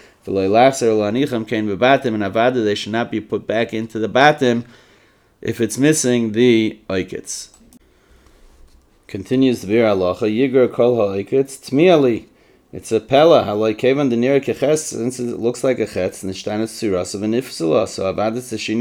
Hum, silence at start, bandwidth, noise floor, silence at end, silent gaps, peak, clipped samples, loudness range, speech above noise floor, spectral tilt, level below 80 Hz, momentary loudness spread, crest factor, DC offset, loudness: none; 0.25 s; 17.5 kHz; -54 dBFS; 0 s; none; 0 dBFS; under 0.1%; 5 LU; 37 dB; -5 dB/octave; -56 dBFS; 11 LU; 18 dB; under 0.1%; -17 LUFS